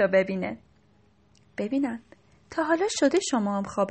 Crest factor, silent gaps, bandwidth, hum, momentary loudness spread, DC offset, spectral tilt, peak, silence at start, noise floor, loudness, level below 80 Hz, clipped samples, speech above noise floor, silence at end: 18 dB; none; 8.8 kHz; none; 14 LU; under 0.1%; -4.5 dB/octave; -10 dBFS; 0 s; -62 dBFS; -27 LUFS; -64 dBFS; under 0.1%; 36 dB; 0 s